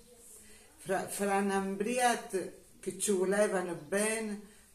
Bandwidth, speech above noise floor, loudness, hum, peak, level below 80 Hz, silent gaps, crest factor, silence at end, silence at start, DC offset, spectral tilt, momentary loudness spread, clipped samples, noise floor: 14.5 kHz; 23 dB; -32 LUFS; none; -16 dBFS; -68 dBFS; none; 18 dB; 0.25 s; 0.1 s; under 0.1%; -4 dB/octave; 18 LU; under 0.1%; -55 dBFS